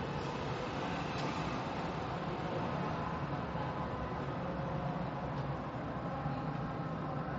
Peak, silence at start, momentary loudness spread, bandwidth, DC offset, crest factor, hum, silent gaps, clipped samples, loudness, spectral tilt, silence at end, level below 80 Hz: -24 dBFS; 0 s; 2 LU; 7.8 kHz; under 0.1%; 14 dB; none; none; under 0.1%; -39 LUFS; -7 dB/octave; 0 s; -54 dBFS